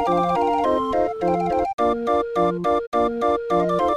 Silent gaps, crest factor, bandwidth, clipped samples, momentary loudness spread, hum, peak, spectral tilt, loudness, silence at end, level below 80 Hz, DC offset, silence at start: 1.74-1.78 s, 2.87-2.92 s; 14 dB; 12 kHz; under 0.1%; 3 LU; none; -8 dBFS; -7 dB/octave; -21 LUFS; 0 s; -46 dBFS; under 0.1%; 0 s